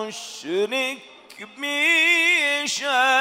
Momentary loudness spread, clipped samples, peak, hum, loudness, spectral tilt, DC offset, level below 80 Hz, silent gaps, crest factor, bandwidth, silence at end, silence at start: 19 LU; under 0.1%; -8 dBFS; none; -19 LUFS; -0.5 dB/octave; under 0.1%; -80 dBFS; none; 16 dB; 16 kHz; 0 s; 0 s